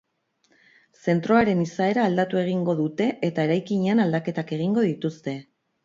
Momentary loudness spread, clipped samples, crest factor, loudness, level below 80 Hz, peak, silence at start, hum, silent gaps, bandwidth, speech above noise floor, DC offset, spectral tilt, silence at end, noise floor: 10 LU; under 0.1%; 18 dB; -24 LUFS; -62 dBFS; -6 dBFS; 1.05 s; none; none; 7.6 kHz; 45 dB; under 0.1%; -7.5 dB/octave; 0.4 s; -67 dBFS